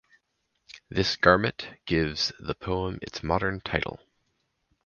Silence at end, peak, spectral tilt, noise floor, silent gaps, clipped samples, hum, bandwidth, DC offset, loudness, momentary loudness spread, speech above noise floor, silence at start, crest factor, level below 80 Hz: 0.9 s; -2 dBFS; -5 dB/octave; -76 dBFS; none; under 0.1%; none; 7.2 kHz; under 0.1%; -27 LUFS; 14 LU; 49 dB; 0.7 s; 26 dB; -46 dBFS